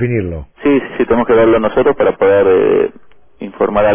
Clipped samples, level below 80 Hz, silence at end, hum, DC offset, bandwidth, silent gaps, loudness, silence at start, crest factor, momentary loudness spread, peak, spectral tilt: under 0.1%; -36 dBFS; 0 s; none; under 0.1%; 3.6 kHz; none; -12 LUFS; 0 s; 10 dB; 10 LU; -2 dBFS; -11 dB/octave